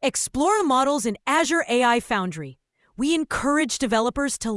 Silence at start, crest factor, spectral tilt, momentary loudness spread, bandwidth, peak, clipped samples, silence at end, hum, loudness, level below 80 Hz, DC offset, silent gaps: 0 s; 16 dB; -3 dB/octave; 6 LU; 12 kHz; -6 dBFS; under 0.1%; 0 s; none; -22 LUFS; -50 dBFS; under 0.1%; none